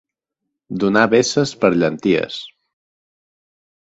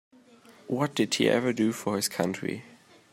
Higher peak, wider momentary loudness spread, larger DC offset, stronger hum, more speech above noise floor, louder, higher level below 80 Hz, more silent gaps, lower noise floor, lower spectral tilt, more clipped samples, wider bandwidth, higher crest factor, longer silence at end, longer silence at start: first, 0 dBFS vs -8 dBFS; first, 14 LU vs 10 LU; neither; neither; first, 63 dB vs 28 dB; first, -17 LUFS vs -27 LUFS; first, -56 dBFS vs -74 dBFS; neither; first, -79 dBFS vs -55 dBFS; about the same, -5 dB/octave vs -4.5 dB/octave; neither; second, 8.2 kHz vs 16 kHz; about the same, 20 dB vs 20 dB; first, 1.35 s vs 0.45 s; first, 0.7 s vs 0.5 s